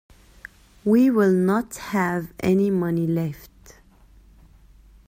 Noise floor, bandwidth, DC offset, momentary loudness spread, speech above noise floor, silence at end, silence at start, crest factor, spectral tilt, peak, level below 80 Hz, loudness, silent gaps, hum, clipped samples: -52 dBFS; 16 kHz; under 0.1%; 10 LU; 31 dB; 1.6 s; 0.85 s; 16 dB; -7.5 dB/octave; -8 dBFS; -52 dBFS; -22 LUFS; none; none; under 0.1%